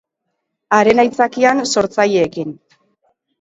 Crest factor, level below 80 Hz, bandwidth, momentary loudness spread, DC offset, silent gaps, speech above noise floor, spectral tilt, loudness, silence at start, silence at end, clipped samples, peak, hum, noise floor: 16 dB; -54 dBFS; 8 kHz; 8 LU; under 0.1%; none; 60 dB; -4 dB/octave; -14 LUFS; 0.7 s; 0.85 s; under 0.1%; 0 dBFS; none; -74 dBFS